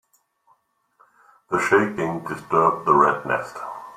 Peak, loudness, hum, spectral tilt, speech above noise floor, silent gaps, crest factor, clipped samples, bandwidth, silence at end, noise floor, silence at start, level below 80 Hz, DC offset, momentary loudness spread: -2 dBFS; -21 LUFS; none; -6 dB/octave; 43 dB; none; 20 dB; under 0.1%; 15 kHz; 0.05 s; -64 dBFS; 1.5 s; -62 dBFS; under 0.1%; 12 LU